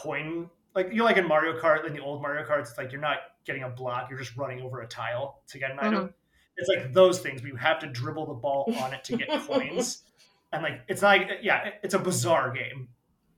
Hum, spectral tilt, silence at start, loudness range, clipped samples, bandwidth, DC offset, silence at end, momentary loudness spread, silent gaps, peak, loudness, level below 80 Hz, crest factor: none; -4.5 dB/octave; 0 s; 6 LU; under 0.1%; 17.5 kHz; under 0.1%; 0.5 s; 14 LU; none; -6 dBFS; -28 LUFS; -68 dBFS; 22 dB